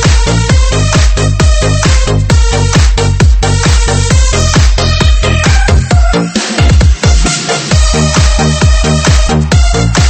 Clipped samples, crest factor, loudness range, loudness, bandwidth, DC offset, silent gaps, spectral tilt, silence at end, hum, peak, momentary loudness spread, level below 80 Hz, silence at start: 0.5%; 8 dB; 0 LU; -9 LUFS; 8.8 kHz; under 0.1%; none; -4.5 dB/octave; 0 s; none; 0 dBFS; 2 LU; -10 dBFS; 0 s